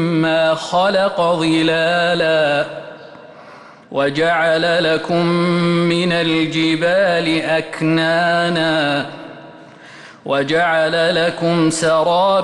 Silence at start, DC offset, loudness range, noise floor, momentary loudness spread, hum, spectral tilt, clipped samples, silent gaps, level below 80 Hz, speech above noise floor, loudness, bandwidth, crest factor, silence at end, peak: 0 s; under 0.1%; 2 LU; -40 dBFS; 5 LU; none; -5 dB/octave; under 0.1%; none; -56 dBFS; 24 dB; -16 LUFS; 11.5 kHz; 10 dB; 0 s; -6 dBFS